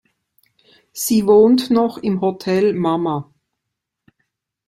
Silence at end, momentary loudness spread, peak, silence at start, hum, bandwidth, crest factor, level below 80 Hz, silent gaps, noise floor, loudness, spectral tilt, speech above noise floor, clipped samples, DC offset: 1.45 s; 12 LU; -2 dBFS; 0.95 s; none; 16 kHz; 16 dB; -58 dBFS; none; -80 dBFS; -17 LUFS; -5.5 dB/octave; 64 dB; under 0.1%; under 0.1%